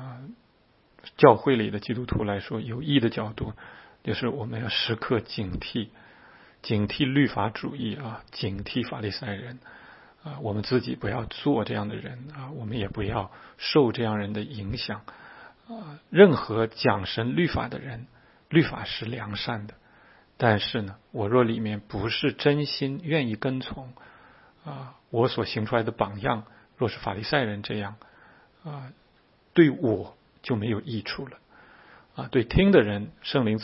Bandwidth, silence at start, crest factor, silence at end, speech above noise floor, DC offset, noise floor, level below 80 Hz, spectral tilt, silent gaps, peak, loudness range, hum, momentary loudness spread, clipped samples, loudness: 5.8 kHz; 0 s; 26 dB; 0 s; 36 dB; under 0.1%; -62 dBFS; -50 dBFS; -10 dB/octave; none; -2 dBFS; 6 LU; none; 20 LU; under 0.1%; -26 LUFS